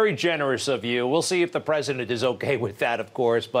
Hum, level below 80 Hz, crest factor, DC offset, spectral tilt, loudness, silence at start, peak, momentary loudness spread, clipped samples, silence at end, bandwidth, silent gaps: none; -70 dBFS; 14 dB; under 0.1%; -4.5 dB/octave; -24 LUFS; 0 s; -10 dBFS; 3 LU; under 0.1%; 0 s; 16 kHz; none